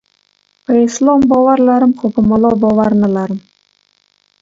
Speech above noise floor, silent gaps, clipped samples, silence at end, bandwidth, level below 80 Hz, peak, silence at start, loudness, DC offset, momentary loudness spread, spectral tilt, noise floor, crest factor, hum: 48 dB; none; under 0.1%; 1.05 s; 7.8 kHz; -46 dBFS; 0 dBFS; 0.7 s; -12 LUFS; under 0.1%; 9 LU; -7 dB/octave; -58 dBFS; 12 dB; 50 Hz at -45 dBFS